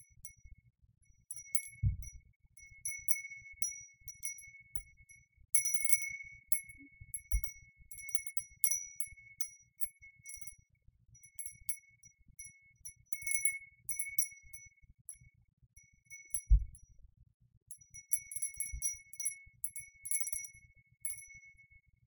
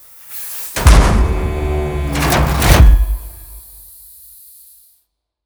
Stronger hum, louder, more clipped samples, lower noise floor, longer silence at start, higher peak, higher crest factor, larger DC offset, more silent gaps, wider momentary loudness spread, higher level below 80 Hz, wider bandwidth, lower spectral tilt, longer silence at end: neither; second, -36 LUFS vs -14 LUFS; second, under 0.1% vs 0.1%; about the same, -67 dBFS vs -65 dBFS; about the same, 0.25 s vs 0.3 s; second, -10 dBFS vs 0 dBFS; first, 30 dB vs 14 dB; neither; first, 2.36-2.40 s, 15.01-15.05 s, 15.53-15.57 s, 17.34-17.40 s, 17.57-17.66 s vs none; second, 21 LU vs 25 LU; second, -46 dBFS vs -16 dBFS; about the same, 19 kHz vs over 20 kHz; second, -1 dB/octave vs -5 dB/octave; second, 0.55 s vs 1.85 s